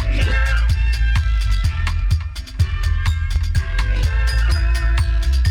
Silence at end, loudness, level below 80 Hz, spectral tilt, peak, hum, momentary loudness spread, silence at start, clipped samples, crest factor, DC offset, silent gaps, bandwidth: 0 s; -20 LUFS; -18 dBFS; -5 dB/octave; -6 dBFS; none; 4 LU; 0 s; under 0.1%; 10 dB; under 0.1%; none; 11.5 kHz